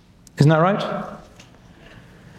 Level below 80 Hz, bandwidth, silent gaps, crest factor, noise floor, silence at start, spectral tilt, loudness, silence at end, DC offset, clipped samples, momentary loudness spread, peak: -54 dBFS; 9.8 kHz; none; 22 dB; -47 dBFS; 0.35 s; -7.5 dB/octave; -19 LUFS; 1.15 s; under 0.1%; under 0.1%; 25 LU; 0 dBFS